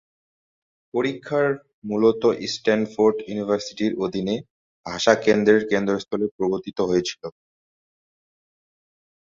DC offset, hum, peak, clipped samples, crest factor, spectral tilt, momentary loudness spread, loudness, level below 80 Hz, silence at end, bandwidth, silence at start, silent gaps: under 0.1%; none; -2 dBFS; under 0.1%; 22 dB; -5 dB/octave; 12 LU; -22 LUFS; -60 dBFS; 1.9 s; 7.6 kHz; 0.95 s; 1.74-1.82 s, 4.50-4.84 s, 6.31-6.39 s